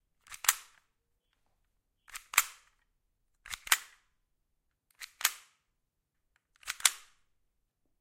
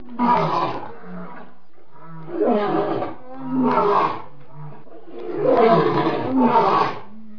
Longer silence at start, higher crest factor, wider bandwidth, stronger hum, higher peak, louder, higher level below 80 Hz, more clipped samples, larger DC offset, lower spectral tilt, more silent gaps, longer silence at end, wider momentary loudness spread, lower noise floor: first, 0.3 s vs 0 s; first, 34 dB vs 18 dB; first, 16.5 kHz vs 5.4 kHz; neither; about the same, -4 dBFS vs -4 dBFS; second, -31 LUFS vs -19 LUFS; second, -70 dBFS vs -60 dBFS; neither; second, under 0.1% vs 3%; second, 3.5 dB/octave vs -8 dB/octave; neither; first, 1 s vs 0 s; about the same, 21 LU vs 22 LU; first, -82 dBFS vs -52 dBFS